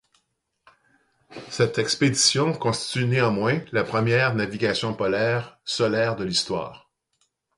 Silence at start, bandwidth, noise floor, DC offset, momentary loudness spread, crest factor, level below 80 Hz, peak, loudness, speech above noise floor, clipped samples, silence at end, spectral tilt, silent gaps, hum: 1.3 s; 11.5 kHz; -74 dBFS; under 0.1%; 10 LU; 20 dB; -58 dBFS; -4 dBFS; -23 LUFS; 51 dB; under 0.1%; 0.8 s; -4 dB/octave; none; none